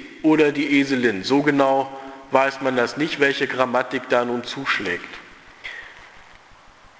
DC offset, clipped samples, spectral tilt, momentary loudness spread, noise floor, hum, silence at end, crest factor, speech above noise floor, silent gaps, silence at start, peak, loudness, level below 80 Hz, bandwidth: under 0.1%; under 0.1%; -5 dB/octave; 18 LU; -48 dBFS; none; 0.8 s; 22 dB; 28 dB; none; 0 s; 0 dBFS; -20 LUFS; -60 dBFS; 8 kHz